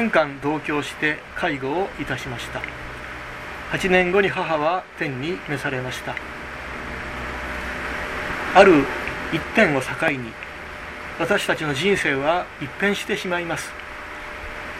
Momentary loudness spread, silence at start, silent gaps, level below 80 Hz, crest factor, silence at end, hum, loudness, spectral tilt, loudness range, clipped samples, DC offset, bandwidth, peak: 15 LU; 0 s; none; -44 dBFS; 22 dB; 0 s; none; -22 LUFS; -5 dB/octave; 7 LU; under 0.1%; under 0.1%; 15.5 kHz; 0 dBFS